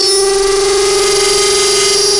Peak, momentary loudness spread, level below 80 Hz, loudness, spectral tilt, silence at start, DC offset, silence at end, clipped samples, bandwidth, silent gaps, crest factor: -2 dBFS; 2 LU; -34 dBFS; -9 LUFS; -0.5 dB/octave; 0 s; under 0.1%; 0 s; under 0.1%; 11.5 kHz; none; 10 dB